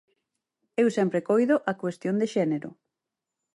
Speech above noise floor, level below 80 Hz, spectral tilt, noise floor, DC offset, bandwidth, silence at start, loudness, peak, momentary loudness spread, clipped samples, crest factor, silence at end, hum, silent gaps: 62 dB; -76 dBFS; -7 dB/octave; -87 dBFS; under 0.1%; 11.5 kHz; 0.8 s; -26 LUFS; -10 dBFS; 10 LU; under 0.1%; 16 dB; 0.8 s; none; none